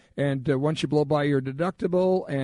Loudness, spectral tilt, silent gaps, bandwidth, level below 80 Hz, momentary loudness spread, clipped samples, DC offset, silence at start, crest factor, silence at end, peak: -25 LUFS; -7.5 dB/octave; none; 10.5 kHz; -58 dBFS; 5 LU; under 0.1%; under 0.1%; 0.15 s; 12 dB; 0 s; -12 dBFS